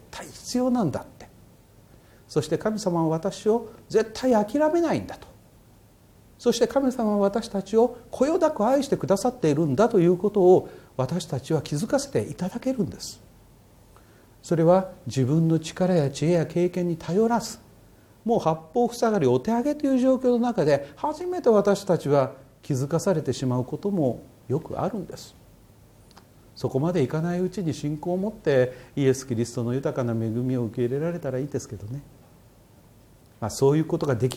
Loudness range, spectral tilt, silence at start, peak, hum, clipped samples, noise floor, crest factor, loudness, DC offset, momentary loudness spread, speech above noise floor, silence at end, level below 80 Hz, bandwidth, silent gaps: 7 LU; -6.5 dB/octave; 0.15 s; -6 dBFS; none; under 0.1%; -54 dBFS; 18 dB; -24 LUFS; under 0.1%; 10 LU; 30 dB; 0 s; -56 dBFS; 17 kHz; none